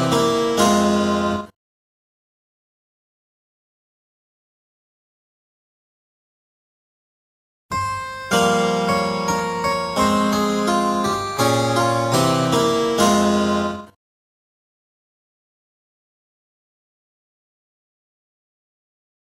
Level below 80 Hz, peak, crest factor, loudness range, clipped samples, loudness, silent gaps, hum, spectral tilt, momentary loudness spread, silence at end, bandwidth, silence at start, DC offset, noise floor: -50 dBFS; -4 dBFS; 20 dB; 12 LU; under 0.1%; -19 LUFS; 1.56-7.69 s; none; -4.5 dB/octave; 8 LU; 5.4 s; 16 kHz; 0 s; under 0.1%; under -90 dBFS